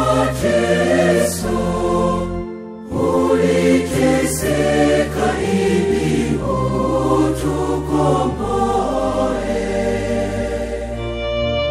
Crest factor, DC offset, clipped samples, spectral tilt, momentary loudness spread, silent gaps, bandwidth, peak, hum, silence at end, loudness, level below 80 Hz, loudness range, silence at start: 14 dB; under 0.1%; under 0.1%; -5.5 dB/octave; 7 LU; none; 15.5 kHz; -4 dBFS; none; 0 s; -18 LUFS; -32 dBFS; 3 LU; 0 s